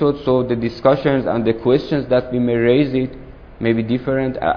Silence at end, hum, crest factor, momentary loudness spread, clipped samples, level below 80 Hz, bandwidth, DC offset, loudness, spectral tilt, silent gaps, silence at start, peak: 0 s; none; 16 dB; 5 LU; under 0.1%; -42 dBFS; 5.4 kHz; under 0.1%; -18 LUFS; -9 dB/octave; none; 0 s; 0 dBFS